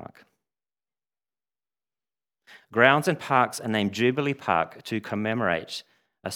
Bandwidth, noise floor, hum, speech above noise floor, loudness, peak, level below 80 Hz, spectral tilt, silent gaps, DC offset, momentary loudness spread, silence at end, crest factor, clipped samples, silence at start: 18 kHz; under -90 dBFS; none; over 66 dB; -24 LUFS; -2 dBFS; -70 dBFS; -5 dB/octave; none; under 0.1%; 13 LU; 0 s; 26 dB; under 0.1%; 0 s